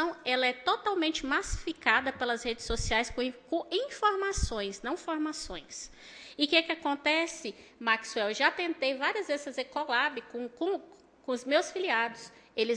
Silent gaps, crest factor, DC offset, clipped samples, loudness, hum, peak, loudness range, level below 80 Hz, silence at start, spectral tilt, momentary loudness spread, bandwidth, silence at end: none; 22 dB; under 0.1%; under 0.1%; -30 LUFS; none; -10 dBFS; 3 LU; -48 dBFS; 0 s; -3 dB/octave; 13 LU; 10.5 kHz; 0 s